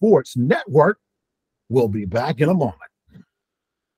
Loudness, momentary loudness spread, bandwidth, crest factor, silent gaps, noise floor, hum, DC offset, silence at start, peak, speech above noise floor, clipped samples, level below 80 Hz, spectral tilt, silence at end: -19 LUFS; 6 LU; 15.5 kHz; 18 dB; none; -82 dBFS; none; under 0.1%; 0 s; -2 dBFS; 65 dB; under 0.1%; -58 dBFS; -8 dB/octave; 1.1 s